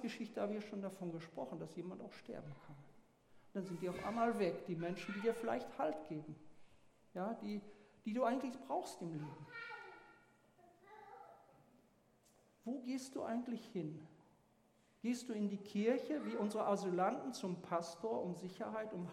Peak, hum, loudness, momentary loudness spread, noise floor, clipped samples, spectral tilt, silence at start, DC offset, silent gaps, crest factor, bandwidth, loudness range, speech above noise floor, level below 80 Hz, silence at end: -24 dBFS; none; -43 LUFS; 18 LU; -73 dBFS; under 0.1%; -6 dB/octave; 0 s; under 0.1%; none; 20 dB; 16 kHz; 10 LU; 31 dB; -80 dBFS; 0 s